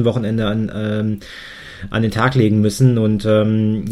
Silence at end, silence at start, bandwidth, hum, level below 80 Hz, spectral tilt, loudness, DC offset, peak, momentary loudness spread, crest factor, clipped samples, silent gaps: 0 s; 0 s; 13.5 kHz; none; -42 dBFS; -7 dB/octave; -17 LUFS; under 0.1%; -2 dBFS; 16 LU; 16 dB; under 0.1%; none